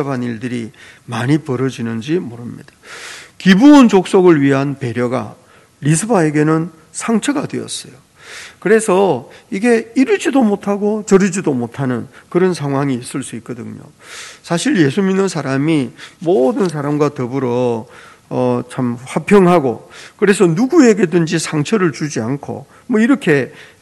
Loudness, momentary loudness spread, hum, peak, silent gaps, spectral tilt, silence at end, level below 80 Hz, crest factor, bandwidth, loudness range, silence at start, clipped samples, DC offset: -15 LUFS; 18 LU; none; 0 dBFS; none; -6 dB/octave; 0.15 s; -56 dBFS; 14 dB; 12.5 kHz; 6 LU; 0 s; 0.3%; under 0.1%